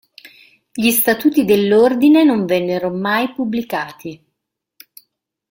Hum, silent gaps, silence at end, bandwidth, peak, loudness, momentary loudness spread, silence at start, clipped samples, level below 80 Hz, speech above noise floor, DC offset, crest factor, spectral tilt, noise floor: none; none; 1.35 s; 17 kHz; -2 dBFS; -15 LUFS; 14 LU; 0.25 s; under 0.1%; -58 dBFS; 62 dB; under 0.1%; 14 dB; -4.5 dB/octave; -77 dBFS